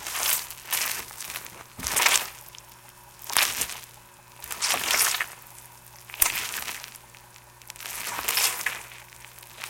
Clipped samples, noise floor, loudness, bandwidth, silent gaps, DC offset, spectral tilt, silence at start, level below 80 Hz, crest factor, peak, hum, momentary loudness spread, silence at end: under 0.1%; -50 dBFS; -25 LUFS; 17 kHz; none; under 0.1%; 1 dB/octave; 0 s; -58 dBFS; 30 dB; 0 dBFS; none; 23 LU; 0 s